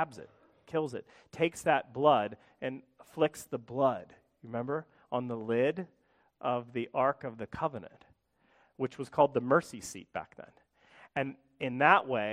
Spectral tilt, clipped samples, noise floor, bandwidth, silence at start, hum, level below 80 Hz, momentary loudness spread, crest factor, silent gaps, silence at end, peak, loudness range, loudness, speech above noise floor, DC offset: -5.5 dB/octave; under 0.1%; -70 dBFS; 15.5 kHz; 0 s; none; -70 dBFS; 16 LU; 26 dB; none; 0 s; -8 dBFS; 4 LU; -32 LUFS; 38 dB; under 0.1%